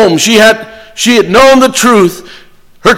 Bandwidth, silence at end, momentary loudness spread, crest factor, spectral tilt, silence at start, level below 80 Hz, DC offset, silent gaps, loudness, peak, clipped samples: 17 kHz; 0 s; 11 LU; 8 dB; -3 dB/octave; 0 s; -38 dBFS; under 0.1%; none; -6 LUFS; 0 dBFS; 0.3%